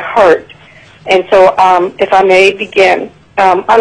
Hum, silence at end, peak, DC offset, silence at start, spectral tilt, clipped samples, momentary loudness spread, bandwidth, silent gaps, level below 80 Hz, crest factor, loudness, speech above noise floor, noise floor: none; 0 s; 0 dBFS; under 0.1%; 0 s; -4 dB/octave; 0.5%; 8 LU; 11 kHz; none; -46 dBFS; 8 dB; -8 LUFS; 31 dB; -38 dBFS